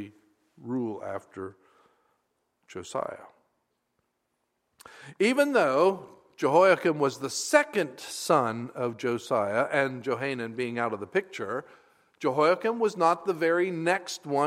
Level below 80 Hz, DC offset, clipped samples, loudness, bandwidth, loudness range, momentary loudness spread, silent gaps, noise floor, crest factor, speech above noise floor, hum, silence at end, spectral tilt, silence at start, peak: -78 dBFS; under 0.1%; under 0.1%; -27 LUFS; 16 kHz; 16 LU; 15 LU; none; -78 dBFS; 22 dB; 51 dB; none; 0 s; -4.5 dB/octave; 0 s; -6 dBFS